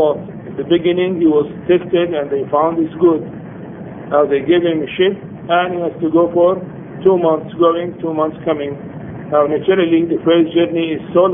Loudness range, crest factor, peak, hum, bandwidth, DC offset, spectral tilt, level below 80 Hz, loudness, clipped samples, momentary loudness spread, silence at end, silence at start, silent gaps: 1 LU; 14 dB; 0 dBFS; none; 3.7 kHz; under 0.1%; -11 dB/octave; -52 dBFS; -15 LUFS; under 0.1%; 15 LU; 0 s; 0 s; none